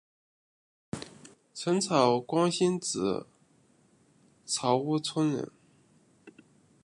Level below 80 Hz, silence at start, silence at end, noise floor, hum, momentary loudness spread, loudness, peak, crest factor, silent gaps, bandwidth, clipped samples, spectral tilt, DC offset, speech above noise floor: -70 dBFS; 0.95 s; 0.55 s; -65 dBFS; none; 18 LU; -28 LUFS; -8 dBFS; 22 dB; none; 11.5 kHz; under 0.1%; -4.5 dB/octave; under 0.1%; 37 dB